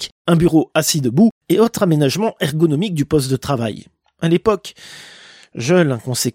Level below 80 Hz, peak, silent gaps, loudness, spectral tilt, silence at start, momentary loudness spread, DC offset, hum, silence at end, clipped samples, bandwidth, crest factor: -48 dBFS; -2 dBFS; 0.12-0.25 s, 1.31-1.41 s; -17 LUFS; -5.5 dB/octave; 0 s; 14 LU; under 0.1%; none; 0 s; under 0.1%; 16.5 kHz; 14 dB